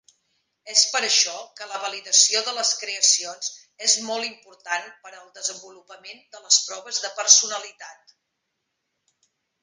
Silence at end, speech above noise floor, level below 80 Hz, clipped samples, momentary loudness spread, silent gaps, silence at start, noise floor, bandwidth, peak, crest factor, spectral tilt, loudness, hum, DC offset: 1.7 s; 54 dB; -86 dBFS; under 0.1%; 19 LU; none; 0.65 s; -78 dBFS; 16 kHz; 0 dBFS; 26 dB; 3 dB/octave; -20 LUFS; none; under 0.1%